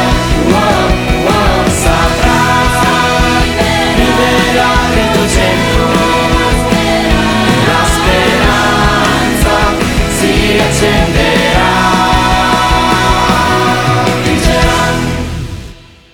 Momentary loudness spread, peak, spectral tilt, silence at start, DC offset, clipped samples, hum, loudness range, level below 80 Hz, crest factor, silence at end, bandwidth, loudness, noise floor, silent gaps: 2 LU; 0 dBFS; -4.5 dB/octave; 0 s; under 0.1%; under 0.1%; none; 1 LU; -18 dBFS; 10 dB; 0.4 s; 19.5 kHz; -10 LUFS; -32 dBFS; none